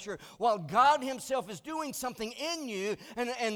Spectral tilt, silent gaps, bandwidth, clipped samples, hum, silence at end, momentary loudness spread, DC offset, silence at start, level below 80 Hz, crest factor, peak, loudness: -3.5 dB/octave; none; over 20 kHz; under 0.1%; none; 0 s; 12 LU; under 0.1%; 0 s; -68 dBFS; 18 dB; -14 dBFS; -31 LUFS